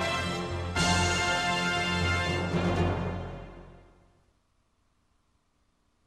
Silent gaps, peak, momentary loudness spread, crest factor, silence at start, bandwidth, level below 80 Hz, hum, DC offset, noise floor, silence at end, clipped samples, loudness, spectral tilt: none; -14 dBFS; 12 LU; 18 dB; 0 s; 14 kHz; -46 dBFS; none; under 0.1%; -71 dBFS; 2.25 s; under 0.1%; -28 LUFS; -4 dB/octave